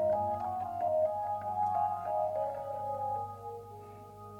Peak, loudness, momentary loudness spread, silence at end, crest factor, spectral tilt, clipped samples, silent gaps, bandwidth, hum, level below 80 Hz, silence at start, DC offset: -22 dBFS; -34 LUFS; 16 LU; 0 s; 14 dB; -7.5 dB/octave; under 0.1%; none; 16.5 kHz; 50 Hz at -55 dBFS; -68 dBFS; 0 s; under 0.1%